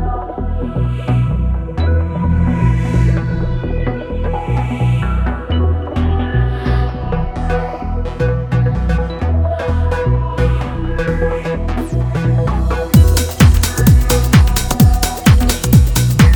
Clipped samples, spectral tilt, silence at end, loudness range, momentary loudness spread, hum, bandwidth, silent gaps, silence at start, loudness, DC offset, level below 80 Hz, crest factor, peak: under 0.1%; -6 dB/octave; 0 s; 6 LU; 9 LU; none; over 20 kHz; none; 0 s; -15 LUFS; under 0.1%; -18 dBFS; 14 dB; 0 dBFS